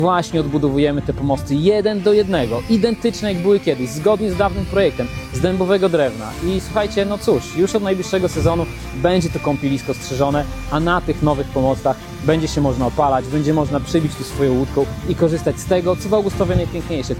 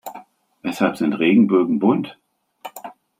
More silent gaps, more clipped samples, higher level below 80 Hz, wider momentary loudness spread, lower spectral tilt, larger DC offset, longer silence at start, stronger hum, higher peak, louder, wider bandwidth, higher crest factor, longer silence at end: neither; neither; first, -34 dBFS vs -66 dBFS; second, 5 LU vs 22 LU; about the same, -6.5 dB/octave vs -7 dB/octave; neither; about the same, 0 s vs 0.05 s; neither; about the same, -2 dBFS vs -4 dBFS; about the same, -18 LUFS vs -18 LUFS; about the same, 16.5 kHz vs 16 kHz; about the same, 16 dB vs 16 dB; second, 0 s vs 0.3 s